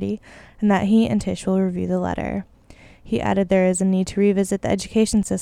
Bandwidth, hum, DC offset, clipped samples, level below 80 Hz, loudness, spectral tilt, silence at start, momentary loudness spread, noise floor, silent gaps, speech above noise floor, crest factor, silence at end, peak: 13 kHz; none; under 0.1%; under 0.1%; -44 dBFS; -21 LUFS; -6 dB/octave; 0 s; 9 LU; -47 dBFS; none; 27 dB; 16 dB; 0 s; -6 dBFS